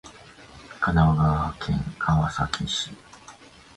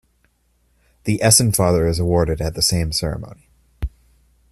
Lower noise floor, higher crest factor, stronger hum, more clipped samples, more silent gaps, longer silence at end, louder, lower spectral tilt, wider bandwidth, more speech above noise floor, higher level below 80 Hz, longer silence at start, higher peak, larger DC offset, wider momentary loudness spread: second, -48 dBFS vs -62 dBFS; about the same, 20 dB vs 20 dB; neither; neither; neither; second, 0.45 s vs 0.65 s; second, -24 LUFS vs -17 LUFS; first, -5.5 dB/octave vs -4 dB/octave; second, 11 kHz vs 15.5 kHz; second, 25 dB vs 45 dB; about the same, -38 dBFS vs -36 dBFS; second, 0.05 s vs 1.05 s; second, -6 dBFS vs 0 dBFS; neither; second, 11 LU vs 19 LU